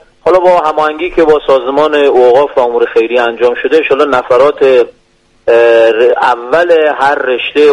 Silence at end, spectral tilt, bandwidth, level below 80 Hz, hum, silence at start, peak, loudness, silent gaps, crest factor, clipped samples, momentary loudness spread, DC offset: 0 s; -5 dB/octave; 9.8 kHz; -42 dBFS; none; 0.25 s; 0 dBFS; -9 LUFS; none; 8 dB; 0.2%; 5 LU; under 0.1%